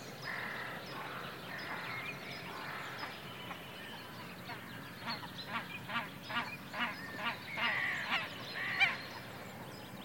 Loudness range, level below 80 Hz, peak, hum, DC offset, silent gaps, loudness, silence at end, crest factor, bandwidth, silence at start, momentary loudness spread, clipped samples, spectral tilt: 8 LU; -74 dBFS; -18 dBFS; none; under 0.1%; none; -39 LUFS; 0 s; 22 dB; 17 kHz; 0 s; 13 LU; under 0.1%; -3.5 dB/octave